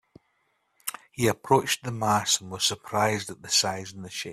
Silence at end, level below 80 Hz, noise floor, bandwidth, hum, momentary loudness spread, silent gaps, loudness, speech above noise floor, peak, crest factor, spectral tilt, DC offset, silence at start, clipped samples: 0 s; -64 dBFS; -72 dBFS; 15.5 kHz; none; 13 LU; none; -26 LUFS; 45 dB; -6 dBFS; 22 dB; -3 dB/octave; under 0.1%; 0.85 s; under 0.1%